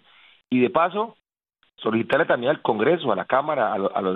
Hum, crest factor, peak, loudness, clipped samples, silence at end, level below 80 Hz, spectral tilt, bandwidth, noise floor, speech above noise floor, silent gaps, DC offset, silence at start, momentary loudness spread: none; 18 dB; -4 dBFS; -22 LUFS; under 0.1%; 0 s; -66 dBFS; -8 dB/octave; 4.9 kHz; -69 dBFS; 47 dB; none; under 0.1%; 0.5 s; 6 LU